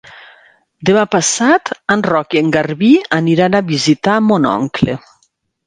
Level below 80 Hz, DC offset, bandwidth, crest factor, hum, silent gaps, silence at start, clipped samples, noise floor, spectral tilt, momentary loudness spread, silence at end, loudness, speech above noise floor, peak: -50 dBFS; under 0.1%; 10 kHz; 14 dB; none; none; 0.1 s; under 0.1%; -61 dBFS; -4.5 dB/octave; 5 LU; 0.7 s; -13 LUFS; 48 dB; 0 dBFS